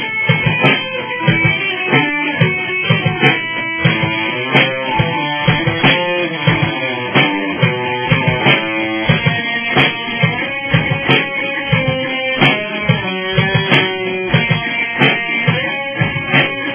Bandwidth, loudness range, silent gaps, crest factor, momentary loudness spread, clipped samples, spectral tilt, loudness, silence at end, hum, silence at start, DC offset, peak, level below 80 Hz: 4 kHz; 1 LU; none; 14 dB; 5 LU; under 0.1%; -9 dB/octave; -14 LUFS; 0 s; none; 0 s; under 0.1%; 0 dBFS; -42 dBFS